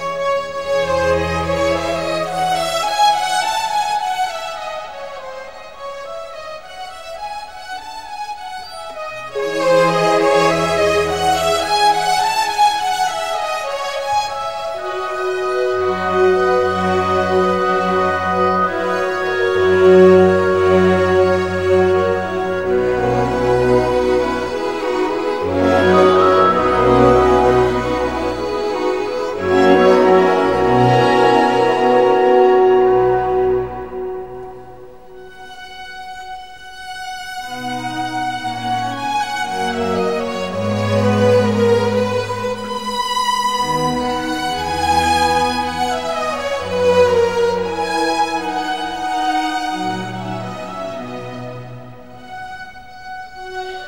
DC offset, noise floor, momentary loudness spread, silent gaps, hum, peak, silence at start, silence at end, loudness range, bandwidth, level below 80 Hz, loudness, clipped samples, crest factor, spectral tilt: 0.8%; -38 dBFS; 18 LU; none; none; 0 dBFS; 0 s; 0 s; 14 LU; 16 kHz; -42 dBFS; -16 LUFS; under 0.1%; 16 dB; -5 dB/octave